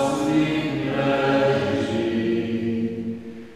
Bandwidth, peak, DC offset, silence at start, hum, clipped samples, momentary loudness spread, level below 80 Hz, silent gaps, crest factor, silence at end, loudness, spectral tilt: 13.5 kHz; -8 dBFS; under 0.1%; 0 s; none; under 0.1%; 8 LU; -52 dBFS; none; 16 dB; 0 s; -23 LUFS; -6.5 dB/octave